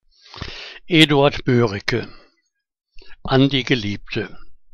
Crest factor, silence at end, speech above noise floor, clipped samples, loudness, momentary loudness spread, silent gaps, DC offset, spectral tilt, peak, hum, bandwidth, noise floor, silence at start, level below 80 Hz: 20 dB; 0.2 s; 53 dB; under 0.1%; -18 LUFS; 20 LU; none; under 0.1%; -6 dB/octave; 0 dBFS; none; 15 kHz; -70 dBFS; 0.35 s; -42 dBFS